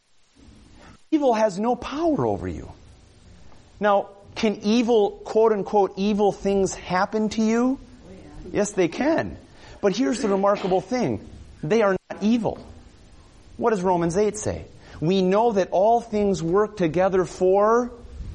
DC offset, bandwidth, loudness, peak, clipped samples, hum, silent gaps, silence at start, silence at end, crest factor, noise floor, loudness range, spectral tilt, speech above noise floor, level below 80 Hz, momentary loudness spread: under 0.1%; 11 kHz; -22 LUFS; -8 dBFS; under 0.1%; none; none; 0.85 s; 0 s; 16 dB; -53 dBFS; 4 LU; -6 dB/octave; 32 dB; -48 dBFS; 10 LU